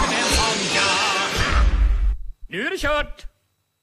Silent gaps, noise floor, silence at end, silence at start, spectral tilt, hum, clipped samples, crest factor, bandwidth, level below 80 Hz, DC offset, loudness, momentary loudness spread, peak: none; -69 dBFS; 0.55 s; 0 s; -3 dB/octave; none; under 0.1%; 16 dB; 14.5 kHz; -24 dBFS; under 0.1%; -20 LUFS; 10 LU; -4 dBFS